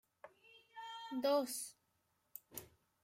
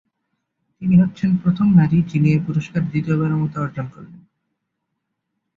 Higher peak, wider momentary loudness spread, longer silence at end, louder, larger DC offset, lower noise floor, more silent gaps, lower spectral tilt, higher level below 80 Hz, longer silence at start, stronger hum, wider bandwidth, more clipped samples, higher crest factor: second, -24 dBFS vs -4 dBFS; first, 24 LU vs 12 LU; second, 0.35 s vs 1.4 s; second, -41 LUFS vs -18 LUFS; neither; first, -81 dBFS vs -77 dBFS; neither; second, -2.5 dB/octave vs -9.5 dB/octave; second, -84 dBFS vs -52 dBFS; second, 0.25 s vs 0.8 s; neither; first, 16 kHz vs 7 kHz; neither; about the same, 20 dB vs 16 dB